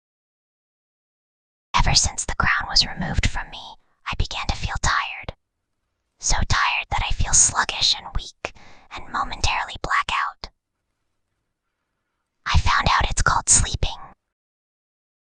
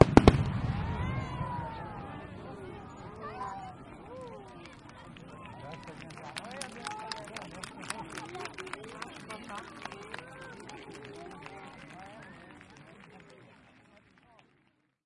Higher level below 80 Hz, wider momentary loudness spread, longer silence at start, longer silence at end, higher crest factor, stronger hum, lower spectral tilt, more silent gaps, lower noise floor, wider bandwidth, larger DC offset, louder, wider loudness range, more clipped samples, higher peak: first, -30 dBFS vs -46 dBFS; first, 18 LU vs 15 LU; first, 1.75 s vs 0 s; second, 1.2 s vs 1.5 s; second, 22 dB vs 34 dB; neither; second, -1.5 dB/octave vs -6.5 dB/octave; neither; first, -77 dBFS vs -72 dBFS; second, 10 kHz vs 11.5 kHz; neither; first, -21 LUFS vs -36 LUFS; second, 6 LU vs 11 LU; neither; about the same, -2 dBFS vs -2 dBFS